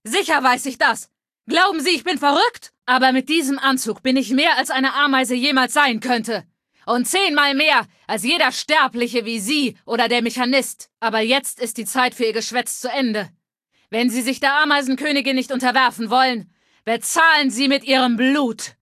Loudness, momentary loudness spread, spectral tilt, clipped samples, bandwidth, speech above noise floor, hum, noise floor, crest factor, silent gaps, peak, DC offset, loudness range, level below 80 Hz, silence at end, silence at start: -18 LUFS; 8 LU; -2 dB/octave; under 0.1%; 14.5 kHz; 48 dB; none; -67 dBFS; 18 dB; none; -2 dBFS; under 0.1%; 3 LU; -70 dBFS; 0.15 s; 0.05 s